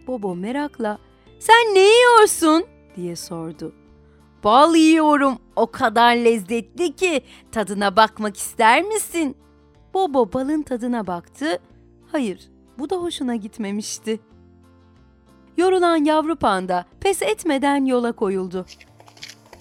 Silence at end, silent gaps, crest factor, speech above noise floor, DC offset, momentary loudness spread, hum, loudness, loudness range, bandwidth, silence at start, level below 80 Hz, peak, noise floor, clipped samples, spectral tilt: 0.3 s; none; 20 dB; 33 dB; under 0.1%; 17 LU; none; -19 LUFS; 10 LU; 17 kHz; 0.05 s; -54 dBFS; 0 dBFS; -52 dBFS; under 0.1%; -3.5 dB/octave